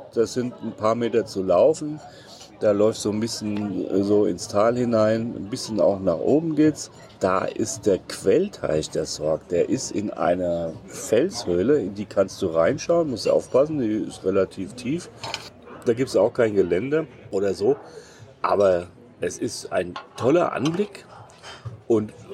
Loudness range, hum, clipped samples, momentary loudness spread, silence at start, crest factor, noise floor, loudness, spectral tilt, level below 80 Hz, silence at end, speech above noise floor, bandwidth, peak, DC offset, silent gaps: 2 LU; none; under 0.1%; 12 LU; 0 s; 16 dB; -43 dBFS; -23 LUFS; -5.5 dB/octave; -56 dBFS; 0 s; 20 dB; 14.5 kHz; -8 dBFS; under 0.1%; none